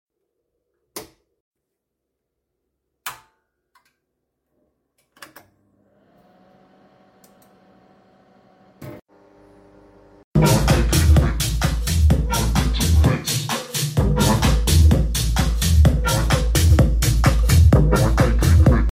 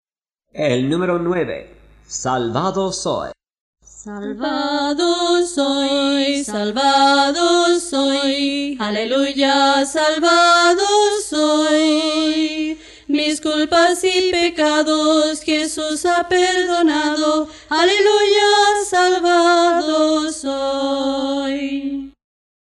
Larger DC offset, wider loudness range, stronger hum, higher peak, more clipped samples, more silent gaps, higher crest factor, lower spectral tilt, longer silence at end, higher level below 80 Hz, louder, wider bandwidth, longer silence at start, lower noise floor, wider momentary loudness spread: neither; first, 10 LU vs 6 LU; neither; about the same, -4 dBFS vs -4 dBFS; neither; first, 1.40-1.52 s, 9.02-9.06 s, 10.24-10.32 s vs 3.60-3.73 s; about the same, 16 dB vs 14 dB; first, -5.5 dB/octave vs -3 dB/octave; second, 0.05 s vs 0.55 s; first, -22 dBFS vs -52 dBFS; about the same, -18 LUFS vs -16 LUFS; first, 16.5 kHz vs 12 kHz; first, 0.95 s vs 0.55 s; first, -80 dBFS vs -72 dBFS; first, 19 LU vs 10 LU